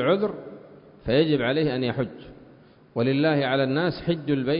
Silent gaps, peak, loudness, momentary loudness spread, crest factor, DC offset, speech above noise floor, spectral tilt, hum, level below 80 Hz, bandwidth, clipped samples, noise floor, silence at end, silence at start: none; -8 dBFS; -24 LUFS; 14 LU; 16 dB; under 0.1%; 29 dB; -11 dB/octave; none; -54 dBFS; 5.4 kHz; under 0.1%; -52 dBFS; 0 s; 0 s